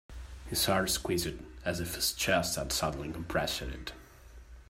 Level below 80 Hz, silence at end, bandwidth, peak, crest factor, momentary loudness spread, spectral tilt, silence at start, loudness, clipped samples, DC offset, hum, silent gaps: -48 dBFS; 0.05 s; 16 kHz; -14 dBFS; 20 dB; 15 LU; -3 dB/octave; 0.1 s; -32 LUFS; under 0.1%; under 0.1%; none; none